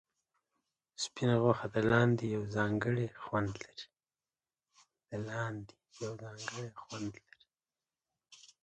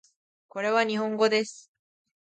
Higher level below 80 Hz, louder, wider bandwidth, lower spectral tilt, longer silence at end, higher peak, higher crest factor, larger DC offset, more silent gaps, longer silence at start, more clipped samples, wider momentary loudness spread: first, -66 dBFS vs -80 dBFS; second, -35 LUFS vs -26 LUFS; about the same, 9.4 kHz vs 9.2 kHz; first, -6 dB/octave vs -4 dB/octave; second, 0.25 s vs 0.75 s; second, -14 dBFS vs -10 dBFS; about the same, 22 dB vs 20 dB; neither; neither; first, 1 s vs 0.55 s; neither; first, 17 LU vs 12 LU